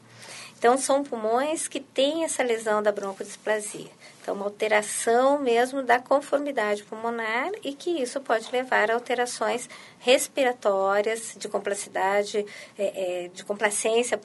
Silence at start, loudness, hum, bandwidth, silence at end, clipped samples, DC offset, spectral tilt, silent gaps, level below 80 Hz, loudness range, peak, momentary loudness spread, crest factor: 0.15 s; -25 LUFS; none; 11.5 kHz; 0 s; under 0.1%; under 0.1%; -2 dB/octave; none; -80 dBFS; 3 LU; -6 dBFS; 11 LU; 20 dB